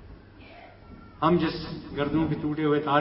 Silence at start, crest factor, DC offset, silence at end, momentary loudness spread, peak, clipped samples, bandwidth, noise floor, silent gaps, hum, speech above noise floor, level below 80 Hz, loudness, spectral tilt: 0 s; 20 dB; under 0.1%; 0 s; 24 LU; -8 dBFS; under 0.1%; 5.8 kHz; -48 dBFS; none; none; 23 dB; -48 dBFS; -27 LUFS; -11 dB/octave